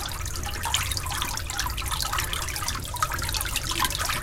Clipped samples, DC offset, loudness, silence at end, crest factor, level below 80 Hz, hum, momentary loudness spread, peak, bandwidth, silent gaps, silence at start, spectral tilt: under 0.1%; under 0.1%; -27 LUFS; 0 s; 22 dB; -36 dBFS; none; 5 LU; -6 dBFS; 17 kHz; none; 0 s; -1.5 dB/octave